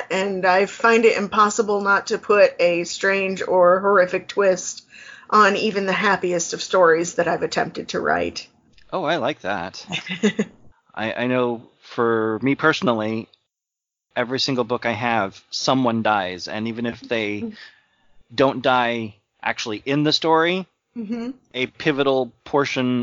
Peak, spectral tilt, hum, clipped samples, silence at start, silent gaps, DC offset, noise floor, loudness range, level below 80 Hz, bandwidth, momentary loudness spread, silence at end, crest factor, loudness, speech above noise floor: -2 dBFS; -4 dB/octave; none; under 0.1%; 0 s; none; under 0.1%; -86 dBFS; 6 LU; -62 dBFS; 7.6 kHz; 12 LU; 0 s; 18 dB; -20 LUFS; 65 dB